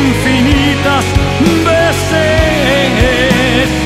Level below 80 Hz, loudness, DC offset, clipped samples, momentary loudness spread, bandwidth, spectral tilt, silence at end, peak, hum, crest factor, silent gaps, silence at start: -22 dBFS; -10 LUFS; under 0.1%; under 0.1%; 2 LU; 16 kHz; -5 dB/octave; 0 s; 0 dBFS; none; 10 dB; none; 0 s